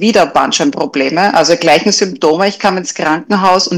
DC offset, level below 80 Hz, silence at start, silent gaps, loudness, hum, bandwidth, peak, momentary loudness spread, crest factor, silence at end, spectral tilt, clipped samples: under 0.1%; -52 dBFS; 0 s; none; -11 LUFS; none; 16.5 kHz; 0 dBFS; 6 LU; 12 dB; 0 s; -3.5 dB/octave; under 0.1%